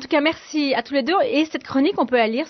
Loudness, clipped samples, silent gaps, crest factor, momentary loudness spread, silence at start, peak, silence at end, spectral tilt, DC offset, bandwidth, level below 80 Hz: -20 LUFS; under 0.1%; none; 14 dB; 3 LU; 0 s; -6 dBFS; 0 s; -4 dB/octave; under 0.1%; 6.4 kHz; -64 dBFS